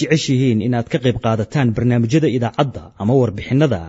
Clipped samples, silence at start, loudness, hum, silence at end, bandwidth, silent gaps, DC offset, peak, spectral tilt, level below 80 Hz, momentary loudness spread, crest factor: under 0.1%; 0 s; -17 LUFS; none; 0 s; 8 kHz; none; under 0.1%; -2 dBFS; -7 dB/octave; -46 dBFS; 4 LU; 14 dB